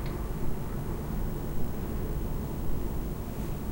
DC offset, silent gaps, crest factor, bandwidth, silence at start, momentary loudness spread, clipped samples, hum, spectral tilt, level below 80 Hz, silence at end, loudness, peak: under 0.1%; none; 14 dB; 16 kHz; 0 s; 1 LU; under 0.1%; none; -7 dB/octave; -34 dBFS; 0 s; -36 LUFS; -18 dBFS